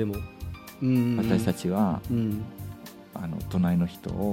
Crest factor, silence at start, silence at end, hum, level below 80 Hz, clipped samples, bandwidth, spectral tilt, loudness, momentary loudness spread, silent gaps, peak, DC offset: 18 dB; 0 s; 0 s; none; -48 dBFS; under 0.1%; 16.5 kHz; -7.5 dB/octave; -27 LUFS; 16 LU; none; -8 dBFS; under 0.1%